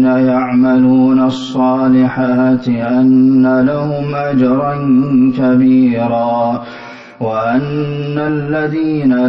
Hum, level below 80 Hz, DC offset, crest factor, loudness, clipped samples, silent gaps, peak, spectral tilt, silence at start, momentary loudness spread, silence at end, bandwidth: none; -48 dBFS; under 0.1%; 8 dB; -12 LUFS; under 0.1%; none; -2 dBFS; -9 dB/octave; 0 s; 8 LU; 0 s; 6 kHz